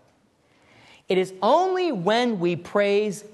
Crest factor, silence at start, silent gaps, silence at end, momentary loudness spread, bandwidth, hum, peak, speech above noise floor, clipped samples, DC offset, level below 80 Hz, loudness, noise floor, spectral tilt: 18 dB; 1.1 s; none; 0.05 s; 4 LU; 12.5 kHz; none; -6 dBFS; 40 dB; under 0.1%; under 0.1%; -72 dBFS; -22 LUFS; -62 dBFS; -5.5 dB/octave